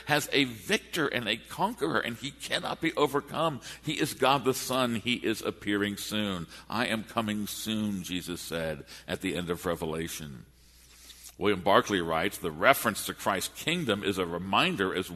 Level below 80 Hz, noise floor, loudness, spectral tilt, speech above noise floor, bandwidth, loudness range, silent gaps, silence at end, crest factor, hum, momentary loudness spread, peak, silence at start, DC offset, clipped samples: -58 dBFS; -56 dBFS; -29 LUFS; -4 dB/octave; 27 dB; 13.5 kHz; 6 LU; none; 0 s; 26 dB; none; 10 LU; -4 dBFS; 0 s; under 0.1%; under 0.1%